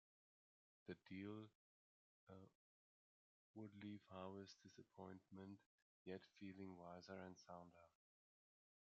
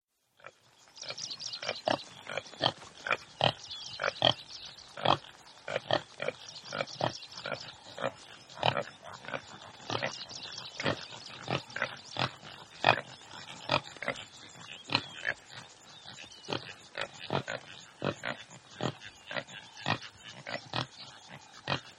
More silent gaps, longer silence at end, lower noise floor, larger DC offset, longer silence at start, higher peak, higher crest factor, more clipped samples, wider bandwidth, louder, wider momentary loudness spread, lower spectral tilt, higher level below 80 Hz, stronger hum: first, 1.55-2.27 s, 2.55-3.54 s, 5.66-6.05 s vs none; first, 1.1 s vs 0 s; first, under -90 dBFS vs -59 dBFS; neither; first, 0.85 s vs 0.45 s; second, -40 dBFS vs -6 dBFS; second, 20 dB vs 30 dB; neither; second, 7 kHz vs 12.5 kHz; second, -60 LUFS vs -35 LUFS; second, 10 LU vs 18 LU; first, -5.5 dB/octave vs -3.5 dB/octave; second, under -90 dBFS vs -70 dBFS; neither